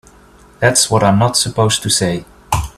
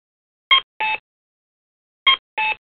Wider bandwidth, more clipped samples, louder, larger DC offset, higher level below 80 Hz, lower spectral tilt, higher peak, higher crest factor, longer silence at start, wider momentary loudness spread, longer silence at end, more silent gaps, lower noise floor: first, 15 kHz vs 4.6 kHz; neither; first, -14 LUFS vs -18 LUFS; neither; first, -36 dBFS vs -64 dBFS; about the same, -3.5 dB/octave vs -2.5 dB/octave; about the same, 0 dBFS vs -2 dBFS; about the same, 16 dB vs 20 dB; about the same, 0.6 s vs 0.5 s; about the same, 9 LU vs 7 LU; about the same, 0.05 s vs 0.15 s; second, none vs 0.63-0.80 s, 1.00-2.06 s, 2.19-2.37 s; second, -44 dBFS vs under -90 dBFS